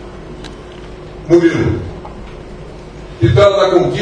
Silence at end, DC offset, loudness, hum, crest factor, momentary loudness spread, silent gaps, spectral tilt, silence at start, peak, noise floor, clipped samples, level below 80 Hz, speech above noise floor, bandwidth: 0 s; under 0.1%; -12 LUFS; none; 14 dB; 23 LU; none; -7 dB/octave; 0 s; 0 dBFS; -31 dBFS; 0.1%; -34 dBFS; 20 dB; 9.4 kHz